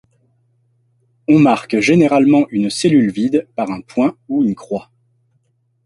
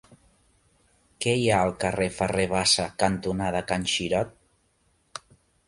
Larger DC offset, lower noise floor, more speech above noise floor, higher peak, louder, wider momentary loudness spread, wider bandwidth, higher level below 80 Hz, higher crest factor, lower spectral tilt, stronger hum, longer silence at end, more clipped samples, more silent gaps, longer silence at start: neither; second, -62 dBFS vs -67 dBFS; first, 48 dB vs 43 dB; first, -2 dBFS vs -6 dBFS; first, -15 LUFS vs -25 LUFS; second, 12 LU vs 16 LU; about the same, 11.5 kHz vs 11.5 kHz; second, -56 dBFS vs -50 dBFS; second, 14 dB vs 22 dB; first, -6 dB/octave vs -3.5 dB/octave; neither; first, 1.05 s vs 0.5 s; neither; neither; about the same, 1.3 s vs 1.2 s